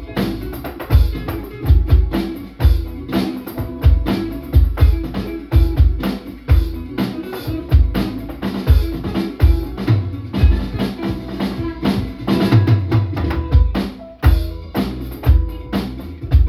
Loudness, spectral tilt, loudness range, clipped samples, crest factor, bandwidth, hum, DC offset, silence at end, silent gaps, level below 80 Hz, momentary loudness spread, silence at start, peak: -19 LUFS; -8 dB/octave; 2 LU; under 0.1%; 16 dB; 14.5 kHz; none; under 0.1%; 0 s; none; -18 dBFS; 10 LU; 0 s; 0 dBFS